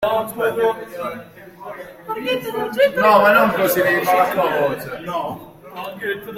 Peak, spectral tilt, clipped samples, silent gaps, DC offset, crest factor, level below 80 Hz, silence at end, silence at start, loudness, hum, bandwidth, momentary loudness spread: -2 dBFS; -4.5 dB/octave; under 0.1%; none; under 0.1%; 18 dB; -56 dBFS; 0 s; 0 s; -18 LUFS; none; 16.5 kHz; 21 LU